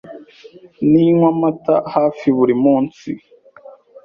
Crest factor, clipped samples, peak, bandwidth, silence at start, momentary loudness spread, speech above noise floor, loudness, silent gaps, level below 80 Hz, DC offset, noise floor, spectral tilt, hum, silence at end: 14 dB; under 0.1%; -2 dBFS; 6.8 kHz; 0.05 s; 14 LU; 28 dB; -15 LUFS; none; -58 dBFS; under 0.1%; -43 dBFS; -9.5 dB/octave; none; 0.85 s